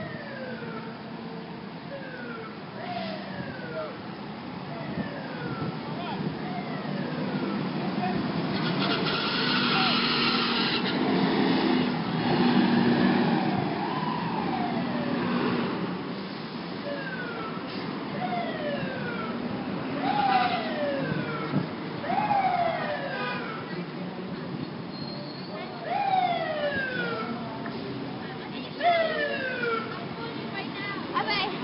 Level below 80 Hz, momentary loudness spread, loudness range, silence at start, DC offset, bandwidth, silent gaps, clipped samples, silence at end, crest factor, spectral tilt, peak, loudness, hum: -64 dBFS; 13 LU; 10 LU; 0 s; under 0.1%; 5.6 kHz; none; under 0.1%; 0 s; 18 dB; -10 dB/octave; -10 dBFS; -29 LUFS; none